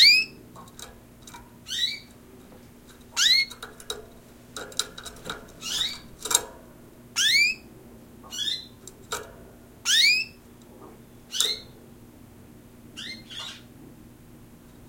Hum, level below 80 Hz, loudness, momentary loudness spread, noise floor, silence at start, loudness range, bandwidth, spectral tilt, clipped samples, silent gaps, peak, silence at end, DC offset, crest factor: 60 Hz at -55 dBFS; -58 dBFS; -24 LUFS; 26 LU; -49 dBFS; 0 s; 8 LU; 17 kHz; 0.5 dB/octave; under 0.1%; none; 0 dBFS; 0.5 s; under 0.1%; 28 dB